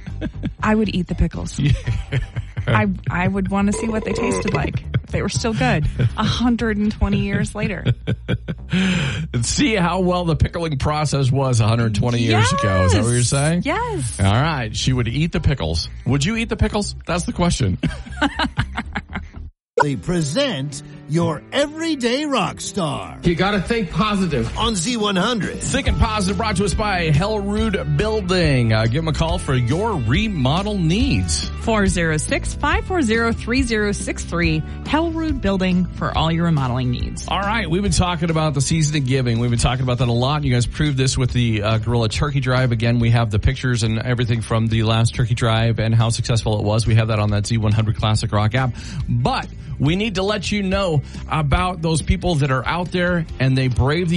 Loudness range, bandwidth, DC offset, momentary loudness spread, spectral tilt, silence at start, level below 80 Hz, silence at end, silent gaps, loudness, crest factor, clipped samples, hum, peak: 3 LU; 11.5 kHz; under 0.1%; 6 LU; -5.5 dB/octave; 0 s; -30 dBFS; 0 s; 19.62-19.66 s; -19 LUFS; 16 dB; under 0.1%; none; -2 dBFS